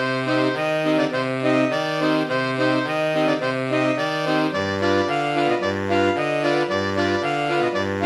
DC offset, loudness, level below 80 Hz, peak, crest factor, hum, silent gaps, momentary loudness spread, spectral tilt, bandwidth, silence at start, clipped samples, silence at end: under 0.1%; -21 LUFS; -64 dBFS; -6 dBFS; 14 dB; none; none; 2 LU; -5.5 dB/octave; 12.5 kHz; 0 s; under 0.1%; 0 s